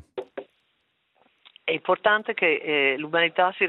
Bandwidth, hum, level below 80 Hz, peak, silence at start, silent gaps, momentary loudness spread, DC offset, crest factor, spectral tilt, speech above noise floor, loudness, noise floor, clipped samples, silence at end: 4.2 kHz; none; -74 dBFS; -6 dBFS; 0.15 s; none; 16 LU; under 0.1%; 20 dB; -6.5 dB/octave; 49 dB; -23 LUFS; -72 dBFS; under 0.1%; 0 s